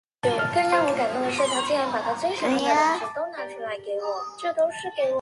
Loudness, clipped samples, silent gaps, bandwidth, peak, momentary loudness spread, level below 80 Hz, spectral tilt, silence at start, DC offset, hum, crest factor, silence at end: -25 LUFS; under 0.1%; none; 11.5 kHz; -8 dBFS; 10 LU; -66 dBFS; -3.5 dB/octave; 0.25 s; under 0.1%; none; 18 dB; 0 s